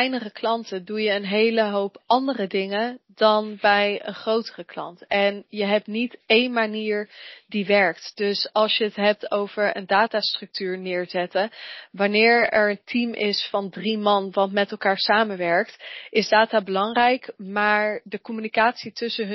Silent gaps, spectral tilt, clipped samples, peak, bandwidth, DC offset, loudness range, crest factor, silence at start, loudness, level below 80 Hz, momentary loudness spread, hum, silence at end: none; -1.5 dB/octave; under 0.1%; -4 dBFS; 6 kHz; under 0.1%; 2 LU; 18 dB; 0 s; -22 LUFS; -70 dBFS; 10 LU; none; 0 s